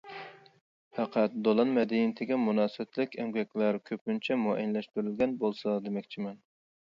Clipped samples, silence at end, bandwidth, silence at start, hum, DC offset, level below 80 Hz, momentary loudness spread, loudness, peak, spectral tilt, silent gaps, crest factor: under 0.1%; 0.6 s; 6.8 kHz; 0.05 s; none; under 0.1%; -74 dBFS; 12 LU; -31 LUFS; -12 dBFS; -8 dB/octave; 0.61-0.91 s, 4.01-4.06 s; 18 dB